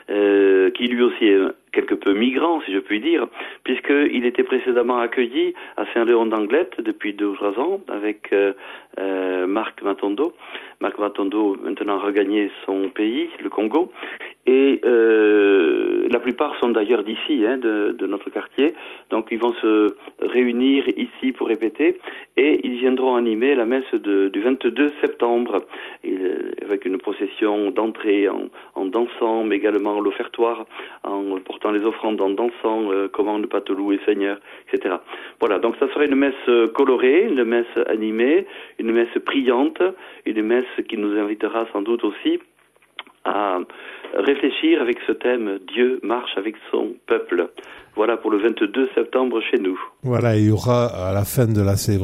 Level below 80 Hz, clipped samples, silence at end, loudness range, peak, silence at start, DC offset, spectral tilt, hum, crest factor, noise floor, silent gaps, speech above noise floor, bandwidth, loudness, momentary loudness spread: -60 dBFS; under 0.1%; 0 s; 5 LU; -4 dBFS; 0.1 s; under 0.1%; -6.5 dB/octave; none; 16 dB; -42 dBFS; none; 22 dB; 15.5 kHz; -20 LUFS; 9 LU